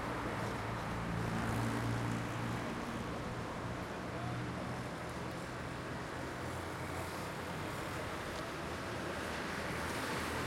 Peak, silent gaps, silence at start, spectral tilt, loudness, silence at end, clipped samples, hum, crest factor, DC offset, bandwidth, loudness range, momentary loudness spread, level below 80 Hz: -24 dBFS; none; 0 s; -5 dB/octave; -40 LUFS; 0 s; under 0.1%; none; 16 dB; under 0.1%; 16.5 kHz; 3 LU; 5 LU; -56 dBFS